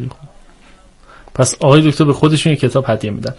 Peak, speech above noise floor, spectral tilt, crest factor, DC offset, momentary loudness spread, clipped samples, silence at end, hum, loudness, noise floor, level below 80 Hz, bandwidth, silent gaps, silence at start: 0 dBFS; 31 dB; -5.5 dB/octave; 14 dB; under 0.1%; 9 LU; under 0.1%; 0.05 s; none; -13 LUFS; -44 dBFS; -42 dBFS; 11.5 kHz; none; 0 s